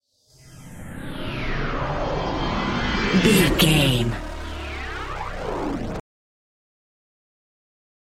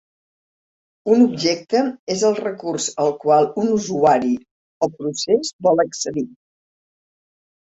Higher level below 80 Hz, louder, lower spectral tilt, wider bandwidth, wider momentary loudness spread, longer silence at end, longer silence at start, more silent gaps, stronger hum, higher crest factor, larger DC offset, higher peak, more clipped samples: first, -34 dBFS vs -62 dBFS; second, -23 LUFS vs -19 LUFS; about the same, -5 dB/octave vs -4.5 dB/octave; first, 16 kHz vs 8.2 kHz; first, 17 LU vs 9 LU; first, 2 s vs 1.4 s; second, 0.45 s vs 1.05 s; second, none vs 1.99-2.07 s, 4.51-4.81 s, 5.53-5.59 s; neither; about the same, 20 dB vs 18 dB; neither; about the same, -4 dBFS vs -2 dBFS; neither